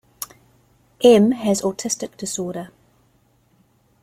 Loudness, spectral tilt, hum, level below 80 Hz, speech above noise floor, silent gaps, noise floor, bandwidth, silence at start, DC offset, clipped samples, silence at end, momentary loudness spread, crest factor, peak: -19 LUFS; -4.5 dB/octave; none; -60 dBFS; 42 dB; none; -60 dBFS; 16 kHz; 0.2 s; under 0.1%; under 0.1%; 1.35 s; 21 LU; 20 dB; -2 dBFS